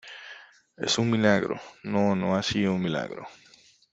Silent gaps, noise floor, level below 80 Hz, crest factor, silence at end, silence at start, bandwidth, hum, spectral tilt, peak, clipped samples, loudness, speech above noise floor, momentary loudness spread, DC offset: none; -57 dBFS; -62 dBFS; 22 dB; 0.6 s; 0.05 s; 8 kHz; none; -5 dB/octave; -6 dBFS; under 0.1%; -26 LUFS; 32 dB; 20 LU; under 0.1%